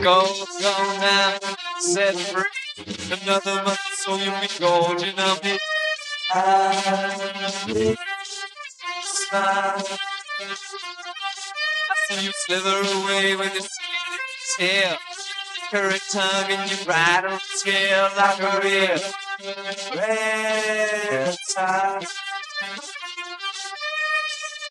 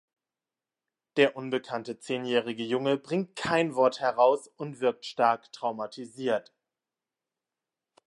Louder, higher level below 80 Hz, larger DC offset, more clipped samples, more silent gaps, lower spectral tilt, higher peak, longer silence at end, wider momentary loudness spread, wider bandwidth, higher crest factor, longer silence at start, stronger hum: first, -22 LUFS vs -28 LUFS; about the same, -68 dBFS vs -72 dBFS; neither; neither; neither; second, -2 dB/octave vs -5 dB/octave; first, -4 dBFS vs -8 dBFS; second, 0 s vs 1.7 s; about the same, 11 LU vs 10 LU; about the same, 12.5 kHz vs 11.5 kHz; about the same, 18 dB vs 22 dB; second, 0 s vs 1.15 s; neither